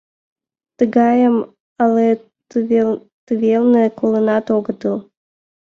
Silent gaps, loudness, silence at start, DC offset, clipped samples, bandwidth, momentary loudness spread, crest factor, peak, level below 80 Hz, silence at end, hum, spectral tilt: 1.60-1.76 s, 3.12-3.27 s; -16 LUFS; 0.8 s; under 0.1%; under 0.1%; 6.6 kHz; 10 LU; 16 dB; -2 dBFS; -62 dBFS; 0.75 s; none; -8.5 dB/octave